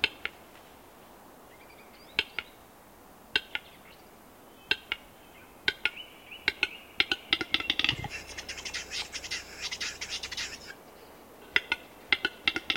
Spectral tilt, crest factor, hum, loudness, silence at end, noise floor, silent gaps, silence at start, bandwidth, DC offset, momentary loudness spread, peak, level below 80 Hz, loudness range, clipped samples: -1 dB/octave; 32 dB; none; -31 LUFS; 0 s; -54 dBFS; none; 0 s; 17 kHz; under 0.1%; 24 LU; -4 dBFS; -60 dBFS; 7 LU; under 0.1%